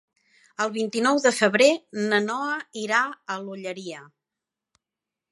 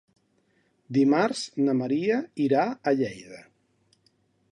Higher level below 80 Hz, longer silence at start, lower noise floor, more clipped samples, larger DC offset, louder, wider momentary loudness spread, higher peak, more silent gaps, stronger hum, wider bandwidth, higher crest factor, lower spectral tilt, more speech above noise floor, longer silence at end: second, -80 dBFS vs -72 dBFS; second, 0.6 s vs 0.9 s; first, -88 dBFS vs -68 dBFS; neither; neither; about the same, -23 LUFS vs -25 LUFS; first, 15 LU vs 8 LU; first, -4 dBFS vs -8 dBFS; neither; neither; about the same, 11.5 kHz vs 10.5 kHz; about the same, 22 dB vs 18 dB; second, -3.5 dB/octave vs -6 dB/octave; first, 64 dB vs 43 dB; first, 1.3 s vs 1.1 s